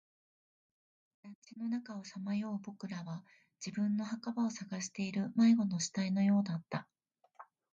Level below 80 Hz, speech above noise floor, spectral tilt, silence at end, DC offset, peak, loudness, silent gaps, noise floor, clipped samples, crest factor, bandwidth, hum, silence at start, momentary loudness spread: -82 dBFS; 25 dB; -5.5 dB/octave; 0.3 s; under 0.1%; -20 dBFS; -36 LUFS; 1.35-1.42 s; -60 dBFS; under 0.1%; 16 dB; 8.8 kHz; none; 1.25 s; 16 LU